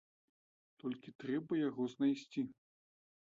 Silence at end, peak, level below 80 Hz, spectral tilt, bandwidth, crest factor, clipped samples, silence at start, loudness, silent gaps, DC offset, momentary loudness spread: 0.7 s; -24 dBFS; -84 dBFS; -6 dB/octave; 7.6 kHz; 16 dB; under 0.1%; 0.85 s; -40 LUFS; 1.15-1.19 s; under 0.1%; 10 LU